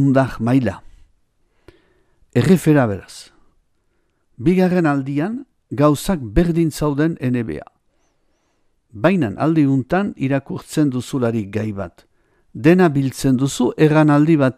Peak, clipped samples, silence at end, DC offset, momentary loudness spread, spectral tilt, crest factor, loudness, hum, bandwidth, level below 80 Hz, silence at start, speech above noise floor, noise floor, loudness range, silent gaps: 0 dBFS; under 0.1%; 0.05 s; under 0.1%; 13 LU; -7 dB/octave; 18 dB; -17 LUFS; none; 15 kHz; -40 dBFS; 0 s; 48 dB; -64 dBFS; 3 LU; none